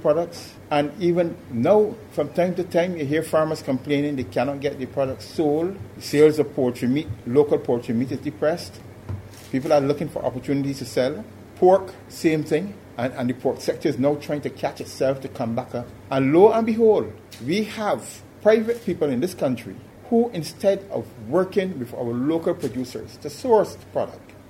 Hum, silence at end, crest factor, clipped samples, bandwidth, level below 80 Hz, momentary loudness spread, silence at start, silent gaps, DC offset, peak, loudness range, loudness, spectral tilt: none; 0.1 s; 20 dB; under 0.1%; 16 kHz; -58 dBFS; 13 LU; 0 s; none; under 0.1%; -2 dBFS; 4 LU; -23 LUFS; -6.5 dB/octave